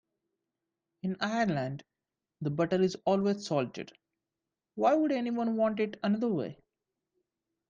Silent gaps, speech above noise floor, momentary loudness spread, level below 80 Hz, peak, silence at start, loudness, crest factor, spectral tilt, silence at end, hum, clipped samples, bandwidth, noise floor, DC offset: none; 59 dB; 12 LU; -72 dBFS; -14 dBFS; 1.05 s; -31 LUFS; 18 dB; -6.5 dB/octave; 1.15 s; none; under 0.1%; 7.6 kHz; -89 dBFS; under 0.1%